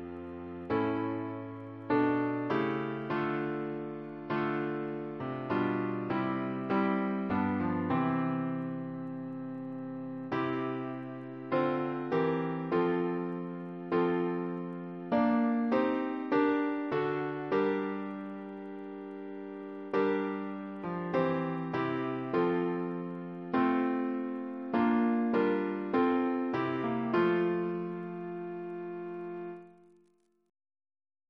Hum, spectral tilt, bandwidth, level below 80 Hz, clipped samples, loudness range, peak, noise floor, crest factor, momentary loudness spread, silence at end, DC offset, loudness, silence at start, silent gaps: none; -9.5 dB/octave; 6 kHz; -70 dBFS; under 0.1%; 5 LU; -16 dBFS; -70 dBFS; 18 dB; 12 LU; 1.6 s; under 0.1%; -33 LUFS; 0 s; none